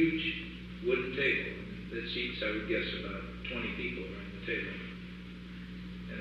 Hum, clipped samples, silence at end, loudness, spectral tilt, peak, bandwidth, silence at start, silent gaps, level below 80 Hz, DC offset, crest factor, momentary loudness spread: 60 Hz at -45 dBFS; under 0.1%; 0 s; -35 LUFS; -7 dB/octave; -16 dBFS; 8.6 kHz; 0 s; none; -50 dBFS; under 0.1%; 20 dB; 15 LU